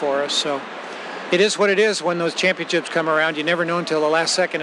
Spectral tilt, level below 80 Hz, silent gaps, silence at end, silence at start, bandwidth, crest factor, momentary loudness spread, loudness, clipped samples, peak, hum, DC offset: -3 dB/octave; -88 dBFS; none; 0 s; 0 s; 12 kHz; 16 dB; 10 LU; -19 LUFS; under 0.1%; -4 dBFS; none; under 0.1%